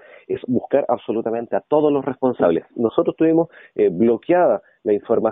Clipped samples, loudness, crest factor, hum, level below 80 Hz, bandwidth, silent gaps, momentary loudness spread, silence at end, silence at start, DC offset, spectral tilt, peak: under 0.1%; -20 LUFS; 16 dB; none; -60 dBFS; 3.9 kHz; none; 7 LU; 0 s; 0.3 s; under 0.1%; -7 dB/octave; -2 dBFS